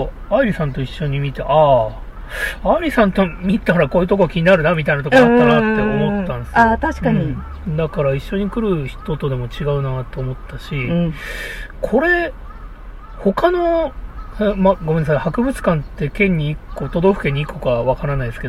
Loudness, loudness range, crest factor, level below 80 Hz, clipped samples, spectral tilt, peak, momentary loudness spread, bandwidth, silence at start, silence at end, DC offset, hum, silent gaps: -17 LUFS; 7 LU; 16 dB; -32 dBFS; under 0.1%; -7.5 dB/octave; -2 dBFS; 13 LU; 14.5 kHz; 0 s; 0 s; under 0.1%; none; none